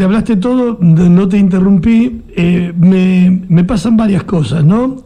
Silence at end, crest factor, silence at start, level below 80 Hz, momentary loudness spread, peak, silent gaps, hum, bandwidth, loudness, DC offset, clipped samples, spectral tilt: 0.05 s; 10 dB; 0 s; -32 dBFS; 5 LU; 0 dBFS; none; none; 9.8 kHz; -10 LUFS; under 0.1%; under 0.1%; -8.5 dB/octave